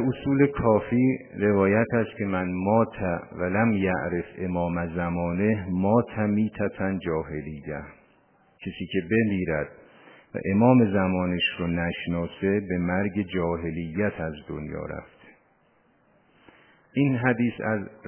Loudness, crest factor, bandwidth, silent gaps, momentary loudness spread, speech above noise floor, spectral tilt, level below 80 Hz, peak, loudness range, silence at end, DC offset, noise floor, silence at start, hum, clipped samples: -25 LUFS; 22 dB; 3.3 kHz; none; 13 LU; 39 dB; -11 dB/octave; -48 dBFS; -4 dBFS; 6 LU; 0 s; under 0.1%; -63 dBFS; 0 s; none; under 0.1%